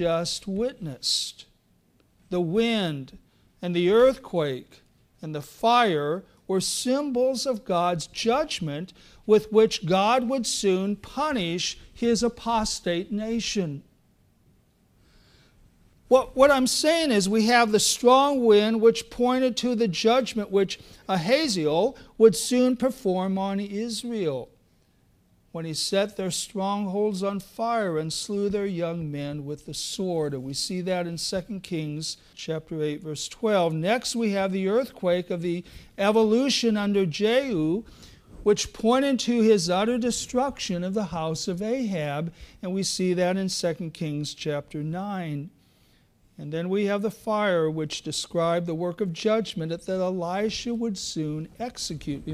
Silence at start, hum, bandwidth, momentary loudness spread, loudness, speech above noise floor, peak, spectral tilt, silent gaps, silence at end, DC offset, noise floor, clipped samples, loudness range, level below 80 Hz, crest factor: 0 s; none; 15.5 kHz; 12 LU; -25 LUFS; 39 dB; -4 dBFS; -4.5 dB/octave; none; 0 s; under 0.1%; -64 dBFS; under 0.1%; 8 LU; -54 dBFS; 20 dB